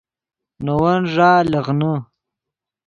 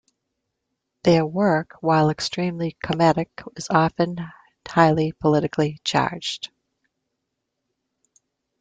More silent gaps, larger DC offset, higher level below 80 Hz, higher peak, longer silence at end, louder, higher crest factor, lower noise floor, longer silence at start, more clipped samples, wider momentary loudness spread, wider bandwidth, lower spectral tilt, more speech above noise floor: neither; neither; first, -50 dBFS vs -56 dBFS; about the same, -2 dBFS vs -2 dBFS; second, 0.85 s vs 2.15 s; first, -17 LUFS vs -21 LUFS; about the same, 18 dB vs 20 dB; first, -85 dBFS vs -79 dBFS; second, 0.6 s vs 1.05 s; neither; about the same, 11 LU vs 12 LU; second, 7.2 kHz vs 9.2 kHz; first, -8 dB/octave vs -6 dB/octave; first, 69 dB vs 58 dB